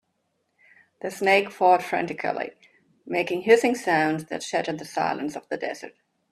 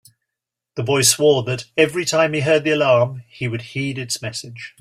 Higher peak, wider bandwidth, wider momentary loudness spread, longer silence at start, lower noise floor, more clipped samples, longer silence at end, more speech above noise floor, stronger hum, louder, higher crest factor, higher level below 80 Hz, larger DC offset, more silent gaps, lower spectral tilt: second, -4 dBFS vs 0 dBFS; second, 14 kHz vs 16 kHz; about the same, 14 LU vs 13 LU; first, 1.05 s vs 0.75 s; second, -74 dBFS vs -84 dBFS; neither; first, 0.4 s vs 0.1 s; second, 50 dB vs 65 dB; neither; second, -24 LUFS vs -18 LUFS; about the same, 22 dB vs 18 dB; second, -72 dBFS vs -58 dBFS; neither; neither; about the same, -4.5 dB/octave vs -3.5 dB/octave